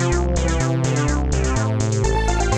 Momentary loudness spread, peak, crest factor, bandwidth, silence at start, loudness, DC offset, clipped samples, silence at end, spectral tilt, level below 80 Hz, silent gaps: 1 LU; -6 dBFS; 12 dB; 10 kHz; 0 s; -20 LUFS; 0.2%; under 0.1%; 0 s; -5.5 dB/octave; -24 dBFS; none